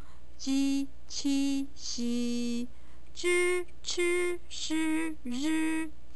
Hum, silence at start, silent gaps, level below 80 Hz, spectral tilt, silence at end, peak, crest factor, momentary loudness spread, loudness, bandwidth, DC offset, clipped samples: none; 0 s; none; -56 dBFS; -3 dB/octave; 0 s; -18 dBFS; 12 dB; 8 LU; -31 LUFS; 11 kHz; 2%; under 0.1%